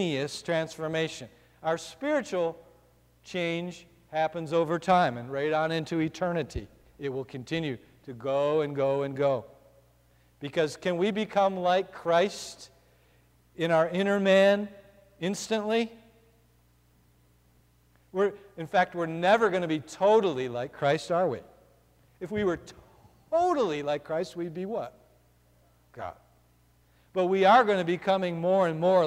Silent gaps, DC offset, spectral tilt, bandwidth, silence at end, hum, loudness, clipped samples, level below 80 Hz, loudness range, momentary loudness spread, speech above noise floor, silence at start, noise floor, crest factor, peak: none; under 0.1%; -5.5 dB/octave; 15 kHz; 0 s; 60 Hz at -60 dBFS; -28 LUFS; under 0.1%; -62 dBFS; 7 LU; 14 LU; 36 dB; 0 s; -63 dBFS; 18 dB; -10 dBFS